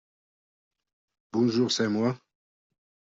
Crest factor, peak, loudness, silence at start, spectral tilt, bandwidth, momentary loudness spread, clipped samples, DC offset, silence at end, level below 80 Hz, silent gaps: 18 dB; -14 dBFS; -26 LUFS; 1.35 s; -5 dB/octave; 7.6 kHz; 8 LU; under 0.1%; under 0.1%; 1.05 s; -72 dBFS; none